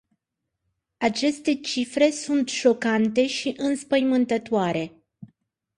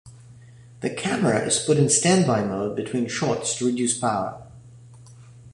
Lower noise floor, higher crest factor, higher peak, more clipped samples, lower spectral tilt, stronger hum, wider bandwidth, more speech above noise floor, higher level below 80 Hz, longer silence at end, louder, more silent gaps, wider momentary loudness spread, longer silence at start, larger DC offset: first, -82 dBFS vs -47 dBFS; about the same, 18 dB vs 18 dB; about the same, -6 dBFS vs -6 dBFS; neither; about the same, -4 dB/octave vs -4 dB/octave; neither; about the same, 11.5 kHz vs 11.5 kHz; first, 59 dB vs 25 dB; second, -66 dBFS vs -58 dBFS; first, 0.55 s vs 0.05 s; about the same, -23 LUFS vs -22 LUFS; neither; second, 6 LU vs 11 LU; first, 1 s vs 0.05 s; neither